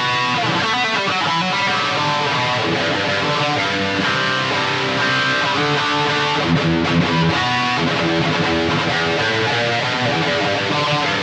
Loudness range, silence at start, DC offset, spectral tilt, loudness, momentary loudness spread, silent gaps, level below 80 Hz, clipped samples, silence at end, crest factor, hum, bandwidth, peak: 1 LU; 0 s; under 0.1%; -4.5 dB/octave; -17 LUFS; 1 LU; none; -48 dBFS; under 0.1%; 0 s; 12 dB; none; 9.6 kHz; -4 dBFS